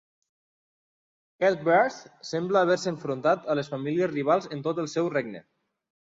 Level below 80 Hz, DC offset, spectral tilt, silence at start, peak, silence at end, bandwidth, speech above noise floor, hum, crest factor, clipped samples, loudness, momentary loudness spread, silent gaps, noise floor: -72 dBFS; under 0.1%; -5.5 dB/octave; 1.4 s; -10 dBFS; 0.6 s; 7.8 kHz; over 64 dB; none; 18 dB; under 0.1%; -26 LUFS; 9 LU; none; under -90 dBFS